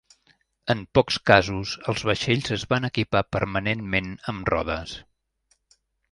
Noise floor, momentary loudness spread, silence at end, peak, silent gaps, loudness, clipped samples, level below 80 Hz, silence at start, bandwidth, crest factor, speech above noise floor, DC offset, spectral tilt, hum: -69 dBFS; 12 LU; 1.1 s; 0 dBFS; none; -24 LUFS; under 0.1%; -46 dBFS; 0.65 s; 11.5 kHz; 24 dB; 45 dB; under 0.1%; -5 dB/octave; none